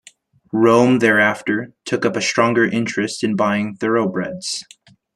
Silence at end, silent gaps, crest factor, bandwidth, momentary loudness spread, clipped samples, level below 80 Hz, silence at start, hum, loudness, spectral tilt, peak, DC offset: 0.55 s; none; 16 dB; 12.5 kHz; 11 LU; under 0.1%; -62 dBFS; 0.55 s; none; -18 LUFS; -5 dB/octave; -2 dBFS; under 0.1%